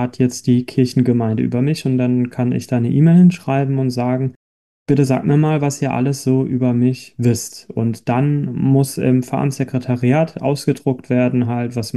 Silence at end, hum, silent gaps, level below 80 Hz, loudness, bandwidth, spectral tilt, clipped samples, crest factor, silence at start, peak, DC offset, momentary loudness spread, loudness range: 0 s; none; 4.36-4.86 s; -54 dBFS; -17 LUFS; 12.5 kHz; -7.5 dB/octave; under 0.1%; 14 dB; 0 s; -4 dBFS; 0.1%; 6 LU; 2 LU